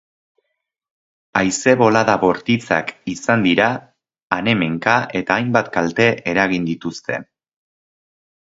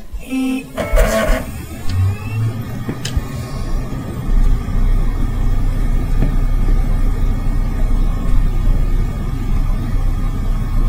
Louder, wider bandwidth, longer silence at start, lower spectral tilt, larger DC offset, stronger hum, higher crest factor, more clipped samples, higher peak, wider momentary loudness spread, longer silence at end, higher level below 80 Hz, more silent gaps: first, -17 LUFS vs -21 LUFS; second, 8 kHz vs 16 kHz; first, 1.35 s vs 0 s; second, -5 dB/octave vs -6.5 dB/octave; neither; neither; first, 20 dB vs 14 dB; neither; about the same, 0 dBFS vs 0 dBFS; first, 11 LU vs 6 LU; first, 1.25 s vs 0 s; second, -54 dBFS vs -16 dBFS; first, 4.22-4.28 s vs none